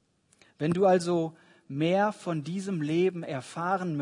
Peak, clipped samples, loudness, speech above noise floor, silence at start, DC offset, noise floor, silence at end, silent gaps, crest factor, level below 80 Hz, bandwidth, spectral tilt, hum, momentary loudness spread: -12 dBFS; under 0.1%; -28 LUFS; 36 dB; 0.6 s; under 0.1%; -64 dBFS; 0 s; none; 18 dB; -72 dBFS; 11 kHz; -6.5 dB/octave; none; 12 LU